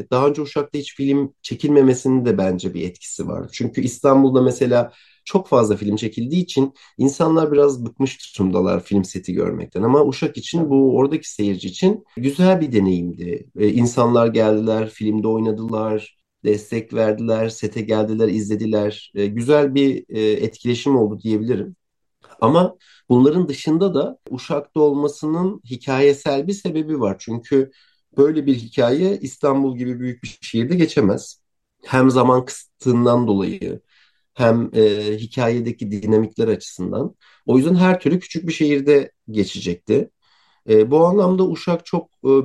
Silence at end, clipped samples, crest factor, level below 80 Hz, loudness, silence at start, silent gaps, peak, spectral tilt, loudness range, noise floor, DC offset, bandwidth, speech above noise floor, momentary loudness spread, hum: 0 s; under 0.1%; 16 dB; -58 dBFS; -19 LUFS; 0 s; none; -2 dBFS; -7 dB/octave; 2 LU; -60 dBFS; under 0.1%; 12 kHz; 42 dB; 11 LU; none